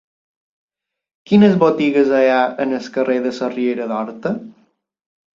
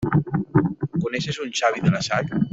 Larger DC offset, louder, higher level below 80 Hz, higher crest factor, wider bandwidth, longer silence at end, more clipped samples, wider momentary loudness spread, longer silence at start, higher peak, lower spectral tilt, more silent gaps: neither; first, -16 LUFS vs -23 LUFS; second, -62 dBFS vs -50 dBFS; about the same, 16 dB vs 18 dB; about the same, 7.4 kHz vs 7.8 kHz; first, 0.85 s vs 0.05 s; neither; first, 11 LU vs 5 LU; first, 1.3 s vs 0 s; about the same, -2 dBFS vs -4 dBFS; first, -7.5 dB/octave vs -6 dB/octave; neither